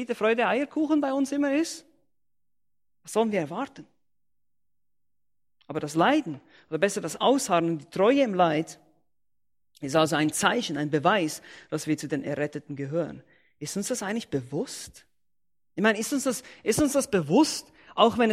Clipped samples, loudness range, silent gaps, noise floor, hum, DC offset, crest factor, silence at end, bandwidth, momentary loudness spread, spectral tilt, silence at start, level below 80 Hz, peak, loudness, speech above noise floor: under 0.1%; 8 LU; none; -88 dBFS; none; under 0.1%; 22 dB; 0 s; 15.5 kHz; 13 LU; -4.5 dB/octave; 0 s; -62 dBFS; -6 dBFS; -26 LUFS; 62 dB